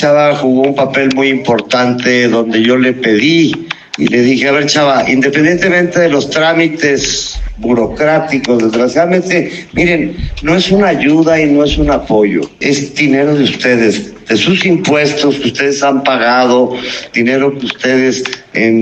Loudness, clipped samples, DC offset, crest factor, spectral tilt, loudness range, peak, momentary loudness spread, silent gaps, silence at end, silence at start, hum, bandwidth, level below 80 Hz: -11 LUFS; under 0.1%; under 0.1%; 10 dB; -4.5 dB/octave; 2 LU; 0 dBFS; 6 LU; none; 0 s; 0 s; none; 8.6 kHz; -32 dBFS